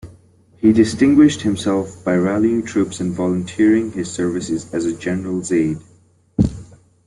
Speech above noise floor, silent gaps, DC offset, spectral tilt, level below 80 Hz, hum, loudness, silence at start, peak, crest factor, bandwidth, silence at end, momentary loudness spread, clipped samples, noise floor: 33 dB; none; under 0.1%; -6 dB/octave; -42 dBFS; none; -18 LUFS; 0.05 s; -2 dBFS; 16 dB; 11.5 kHz; 0.4 s; 10 LU; under 0.1%; -50 dBFS